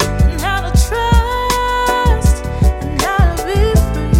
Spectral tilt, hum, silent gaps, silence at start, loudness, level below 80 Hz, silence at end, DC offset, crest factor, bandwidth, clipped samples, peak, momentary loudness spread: -5.5 dB/octave; none; none; 0 s; -15 LUFS; -16 dBFS; 0 s; under 0.1%; 12 dB; 16.5 kHz; under 0.1%; -2 dBFS; 3 LU